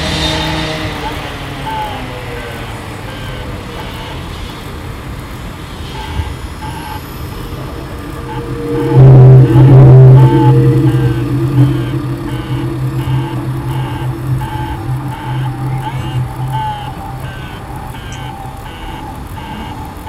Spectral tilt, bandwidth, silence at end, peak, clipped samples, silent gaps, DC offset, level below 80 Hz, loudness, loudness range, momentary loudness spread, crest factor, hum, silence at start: -7.5 dB/octave; 12.5 kHz; 0 s; 0 dBFS; 2%; none; under 0.1%; -28 dBFS; -11 LUFS; 18 LU; 21 LU; 12 dB; none; 0 s